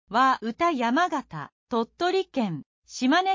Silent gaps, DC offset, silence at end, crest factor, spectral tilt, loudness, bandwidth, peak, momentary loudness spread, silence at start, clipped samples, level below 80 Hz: 1.52-1.67 s, 2.66-2.82 s; under 0.1%; 0 s; 14 dB; -4.5 dB/octave; -25 LUFS; 7.6 kHz; -10 dBFS; 16 LU; 0.1 s; under 0.1%; -64 dBFS